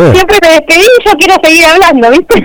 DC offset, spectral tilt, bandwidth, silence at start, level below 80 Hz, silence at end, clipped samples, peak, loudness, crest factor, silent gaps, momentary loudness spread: under 0.1%; -4 dB/octave; over 20 kHz; 0 s; -28 dBFS; 0 s; 5%; 0 dBFS; -3 LUFS; 4 dB; none; 3 LU